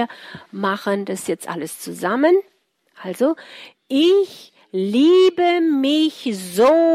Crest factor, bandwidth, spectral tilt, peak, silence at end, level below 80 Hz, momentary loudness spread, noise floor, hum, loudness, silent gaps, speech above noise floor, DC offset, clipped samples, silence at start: 14 dB; 15.5 kHz; -5 dB/octave; -4 dBFS; 0 s; -68 dBFS; 15 LU; -54 dBFS; none; -18 LUFS; none; 36 dB; under 0.1%; under 0.1%; 0 s